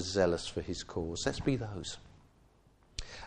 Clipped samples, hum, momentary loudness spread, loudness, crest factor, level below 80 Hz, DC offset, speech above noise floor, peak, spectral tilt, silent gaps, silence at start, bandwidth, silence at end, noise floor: under 0.1%; none; 15 LU; -36 LUFS; 20 dB; -52 dBFS; under 0.1%; 30 dB; -16 dBFS; -4.5 dB/octave; none; 0 s; 10 kHz; 0 s; -65 dBFS